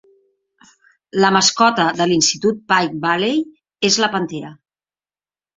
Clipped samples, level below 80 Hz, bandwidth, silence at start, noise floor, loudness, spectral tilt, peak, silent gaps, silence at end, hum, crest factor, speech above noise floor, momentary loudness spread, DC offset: under 0.1%; -60 dBFS; 7.8 kHz; 1.15 s; under -90 dBFS; -16 LUFS; -3 dB/octave; -2 dBFS; none; 1.05 s; none; 18 dB; over 73 dB; 13 LU; under 0.1%